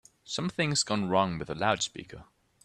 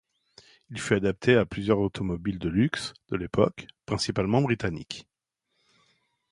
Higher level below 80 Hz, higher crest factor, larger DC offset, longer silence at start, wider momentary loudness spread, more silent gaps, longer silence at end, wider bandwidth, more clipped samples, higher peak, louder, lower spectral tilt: second, -60 dBFS vs -50 dBFS; about the same, 22 dB vs 22 dB; neither; second, 0.25 s vs 0.7 s; second, 10 LU vs 14 LU; neither; second, 0.4 s vs 1.3 s; about the same, 12.5 kHz vs 11.5 kHz; neither; second, -10 dBFS vs -6 dBFS; about the same, -29 LUFS vs -27 LUFS; second, -3.5 dB/octave vs -6 dB/octave